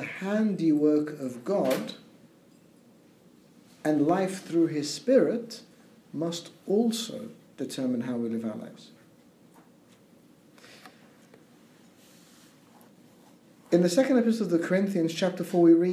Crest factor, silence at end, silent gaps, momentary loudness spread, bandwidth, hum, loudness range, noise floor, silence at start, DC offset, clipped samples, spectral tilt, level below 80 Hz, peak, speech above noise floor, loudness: 20 dB; 0 s; none; 16 LU; 15.5 kHz; none; 9 LU; -57 dBFS; 0 s; under 0.1%; under 0.1%; -6 dB/octave; -80 dBFS; -10 dBFS; 32 dB; -27 LUFS